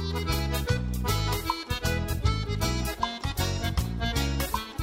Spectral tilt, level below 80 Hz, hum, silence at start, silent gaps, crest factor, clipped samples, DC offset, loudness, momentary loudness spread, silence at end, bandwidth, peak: -4.5 dB/octave; -34 dBFS; none; 0 s; none; 16 dB; under 0.1%; under 0.1%; -29 LUFS; 2 LU; 0 s; 16 kHz; -12 dBFS